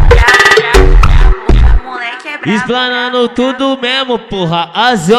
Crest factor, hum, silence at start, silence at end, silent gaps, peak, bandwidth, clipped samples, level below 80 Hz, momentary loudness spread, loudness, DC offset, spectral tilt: 8 dB; none; 0 s; 0 s; none; 0 dBFS; 13 kHz; 5%; -12 dBFS; 10 LU; -10 LUFS; under 0.1%; -5 dB/octave